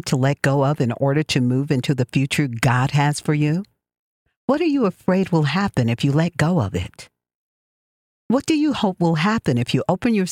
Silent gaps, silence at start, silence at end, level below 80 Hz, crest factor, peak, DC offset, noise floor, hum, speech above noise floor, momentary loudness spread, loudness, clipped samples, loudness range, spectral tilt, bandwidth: 3.99-4.26 s, 4.37-4.48 s, 7.34-8.30 s; 0.05 s; 0 s; -50 dBFS; 16 dB; -4 dBFS; under 0.1%; under -90 dBFS; none; over 71 dB; 4 LU; -20 LUFS; under 0.1%; 3 LU; -6.5 dB/octave; 15.5 kHz